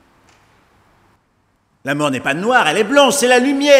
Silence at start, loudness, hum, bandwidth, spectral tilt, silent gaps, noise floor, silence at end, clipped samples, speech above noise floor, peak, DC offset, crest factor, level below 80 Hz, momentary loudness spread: 1.85 s; -14 LUFS; none; 16 kHz; -3 dB/octave; none; -61 dBFS; 0 s; under 0.1%; 48 dB; 0 dBFS; under 0.1%; 16 dB; -62 dBFS; 9 LU